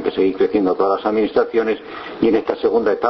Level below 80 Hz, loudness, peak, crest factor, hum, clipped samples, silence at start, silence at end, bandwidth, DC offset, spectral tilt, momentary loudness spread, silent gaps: -52 dBFS; -18 LUFS; -2 dBFS; 16 dB; none; under 0.1%; 0 s; 0 s; 6 kHz; under 0.1%; -8 dB/octave; 4 LU; none